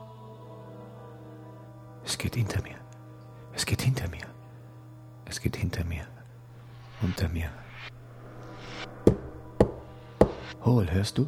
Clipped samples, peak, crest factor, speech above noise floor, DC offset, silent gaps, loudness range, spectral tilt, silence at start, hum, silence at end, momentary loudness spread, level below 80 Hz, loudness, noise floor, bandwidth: under 0.1%; -4 dBFS; 28 dB; 19 dB; under 0.1%; none; 8 LU; -6 dB/octave; 0 s; none; 0 s; 22 LU; -44 dBFS; -29 LUFS; -48 dBFS; 18 kHz